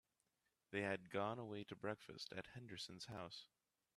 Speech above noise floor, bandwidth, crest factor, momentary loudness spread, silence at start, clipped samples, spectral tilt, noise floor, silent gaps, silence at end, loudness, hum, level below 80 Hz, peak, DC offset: 39 dB; 13 kHz; 22 dB; 10 LU; 0.7 s; under 0.1%; -5 dB/octave; -88 dBFS; none; 0.5 s; -49 LUFS; none; -82 dBFS; -28 dBFS; under 0.1%